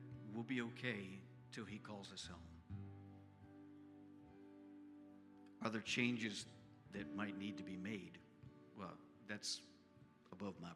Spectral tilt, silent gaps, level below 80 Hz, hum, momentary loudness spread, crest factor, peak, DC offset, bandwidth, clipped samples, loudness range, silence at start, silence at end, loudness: -4 dB/octave; none; -80 dBFS; none; 19 LU; 26 dB; -24 dBFS; under 0.1%; 13 kHz; under 0.1%; 11 LU; 0 s; 0 s; -48 LUFS